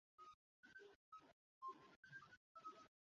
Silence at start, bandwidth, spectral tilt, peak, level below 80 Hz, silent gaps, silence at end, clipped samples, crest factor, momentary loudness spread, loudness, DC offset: 0.2 s; 7.2 kHz; -2 dB/octave; -46 dBFS; under -90 dBFS; 0.34-0.63 s, 0.95-1.12 s, 1.33-1.61 s, 1.96-2.03 s, 2.37-2.55 s; 0.15 s; under 0.1%; 18 dB; 9 LU; -62 LUFS; under 0.1%